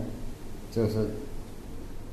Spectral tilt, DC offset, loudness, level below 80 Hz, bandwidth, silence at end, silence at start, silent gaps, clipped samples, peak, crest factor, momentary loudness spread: -7.5 dB/octave; under 0.1%; -34 LUFS; -40 dBFS; 13.5 kHz; 0 s; 0 s; none; under 0.1%; -14 dBFS; 18 dB; 15 LU